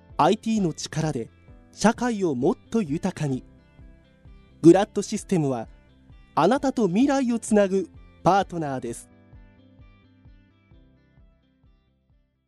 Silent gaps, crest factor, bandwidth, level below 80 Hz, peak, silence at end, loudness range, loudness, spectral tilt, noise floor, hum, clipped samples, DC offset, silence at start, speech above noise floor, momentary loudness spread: none; 22 dB; 12.5 kHz; -52 dBFS; -4 dBFS; 3.1 s; 7 LU; -23 LUFS; -6 dB/octave; -65 dBFS; none; under 0.1%; under 0.1%; 0.1 s; 43 dB; 12 LU